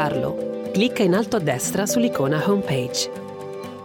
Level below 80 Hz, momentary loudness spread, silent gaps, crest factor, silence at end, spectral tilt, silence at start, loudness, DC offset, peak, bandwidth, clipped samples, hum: -58 dBFS; 12 LU; none; 16 dB; 0 s; -4.5 dB/octave; 0 s; -22 LUFS; under 0.1%; -6 dBFS; 19.5 kHz; under 0.1%; none